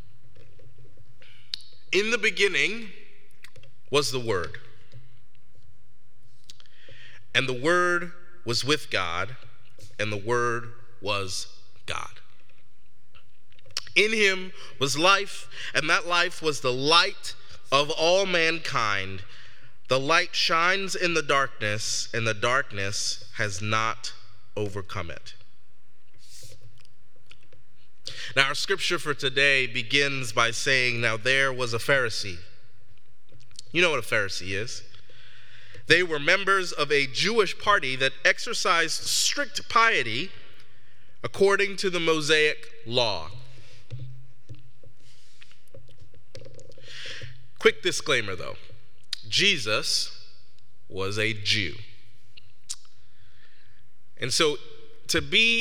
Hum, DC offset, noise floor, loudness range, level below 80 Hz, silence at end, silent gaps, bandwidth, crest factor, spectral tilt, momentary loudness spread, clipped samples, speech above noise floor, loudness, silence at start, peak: none; 3%; -66 dBFS; 9 LU; -64 dBFS; 0 s; none; 17 kHz; 26 dB; -2.5 dB/octave; 18 LU; under 0.1%; 41 dB; -24 LUFS; 1.9 s; -2 dBFS